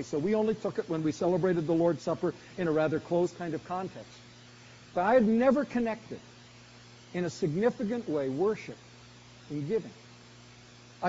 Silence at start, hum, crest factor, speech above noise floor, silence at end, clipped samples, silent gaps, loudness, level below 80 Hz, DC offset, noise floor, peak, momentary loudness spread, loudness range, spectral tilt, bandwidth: 0 s; none; 18 dB; 24 dB; 0 s; under 0.1%; none; -30 LUFS; -64 dBFS; under 0.1%; -53 dBFS; -12 dBFS; 16 LU; 4 LU; -6.5 dB/octave; 7.6 kHz